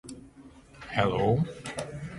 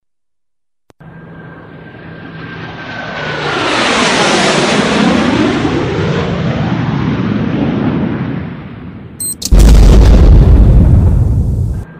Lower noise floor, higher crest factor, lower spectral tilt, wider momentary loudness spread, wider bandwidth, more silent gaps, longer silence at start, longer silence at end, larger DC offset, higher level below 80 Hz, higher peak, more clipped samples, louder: second, -52 dBFS vs -85 dBFS; first, 22 dB vs 10 dB; about the same, -6.5 dB/octave vs -5.5 dB/octave; about the same, 21 LU vs 22 LU; second, 11.5 kHz vs 15 kHz; neither; second, 0.05 s vs 1.05 s; about the same, 0 s vs 0 s; neither; second, -52 dBFS vs -14 dBFS; second, -10 dBFS vs 0 dBFS; neither; second, -29 LUFS vs -11 LUFS